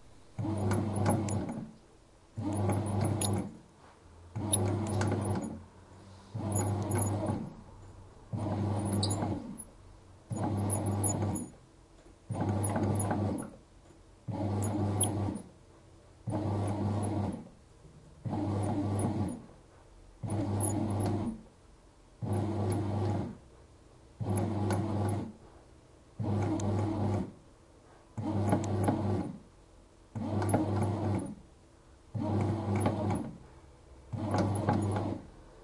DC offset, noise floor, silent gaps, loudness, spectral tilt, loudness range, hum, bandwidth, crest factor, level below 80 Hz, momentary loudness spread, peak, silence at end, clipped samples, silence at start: under 0.1%; -59 dBFS; none; -33 LUFS; -6.5 dB/octave; 3 LU; none; 11.5 kHz; 20 dB; -58 dBFS; 16 LU; -14 dBFS; 0 s; under 0.1%; 0 s